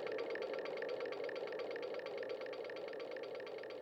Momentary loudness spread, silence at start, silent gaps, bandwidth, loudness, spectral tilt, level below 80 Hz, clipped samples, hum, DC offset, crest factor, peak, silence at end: 4 LU; 0 s; none; 9 kHz; -44 LUFS; -4.5 dB/octave; -88 dBFS; under 0.1%; none; under 0.1%; 14 dB; -30 dBFS; 0 s